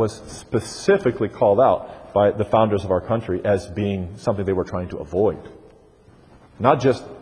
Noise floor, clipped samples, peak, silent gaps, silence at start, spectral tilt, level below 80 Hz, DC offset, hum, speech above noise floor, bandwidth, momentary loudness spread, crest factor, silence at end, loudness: -51 dBFS; under 0.1%; 0 dBFS; none; 0 s; -6.5 dB/octave; -48 dBFS; under 0.1%; none; 30 dB; 10.5 kHz; 9 LU; 20 dB; 0 s; -21 LUFS